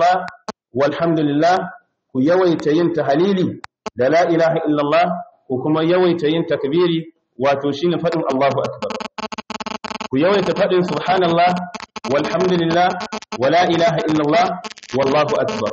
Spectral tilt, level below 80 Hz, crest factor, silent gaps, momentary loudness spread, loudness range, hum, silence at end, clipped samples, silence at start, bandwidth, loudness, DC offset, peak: -6 dB/octave; -58 dBFS; 12 dB; none; 12 LU; 3 LU; none; 0 s; under 0.1%; 0 s; 8 kHz; -18 LUFS; under 0.1%; -6 dBFS